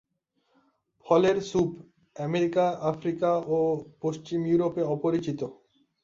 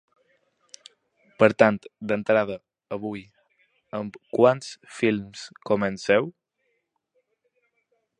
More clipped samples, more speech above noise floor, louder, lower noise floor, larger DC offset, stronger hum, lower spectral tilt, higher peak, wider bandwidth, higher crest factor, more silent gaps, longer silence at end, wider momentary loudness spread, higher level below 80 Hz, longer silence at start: neither; about the same, 48 dB vs 51 dB; second, -27 LUFS vs -24 LUFS; about the same, -74 dBFS vs -75 dBFS; neither; neither; about the same, -7 dB/octave vs -6 dB/octave; second, -8 dBFS vs -2 dBFS; second, 7.6 kHz vs 10.5 kHz; second, 18 dB vs 26 dB; neither; second, 0.5 s vs 1.9 s; second, 10 LU vs 17 LU; about the same, -64 dBFS vs -66 dBFS; second, 1.05 s vs 1.4 s